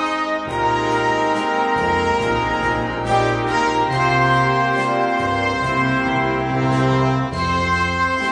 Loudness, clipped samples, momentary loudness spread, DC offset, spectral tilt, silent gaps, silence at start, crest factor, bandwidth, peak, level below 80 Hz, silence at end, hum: -18 LUFS; under 0.1%; 4 LU; under 0.1%; -5.5 dB/octave; none; 0 s; 14 dB; 10.5 kHz; -4 dBFS; -40 dBFS; 0 s; none